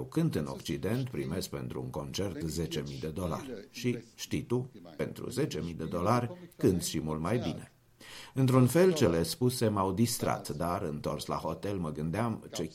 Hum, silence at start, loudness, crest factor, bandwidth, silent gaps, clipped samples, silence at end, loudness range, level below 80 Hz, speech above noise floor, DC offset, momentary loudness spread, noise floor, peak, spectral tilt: none; 0 s; -32 LUFS; 22 dB; 16.5 kHz; none; under 0.1%; 0 s; 7 LU; -56 dBFS; 20 dB; under 0.1%; 11 LU; -51 dBFS; -10 dBFS; -6 dB/octave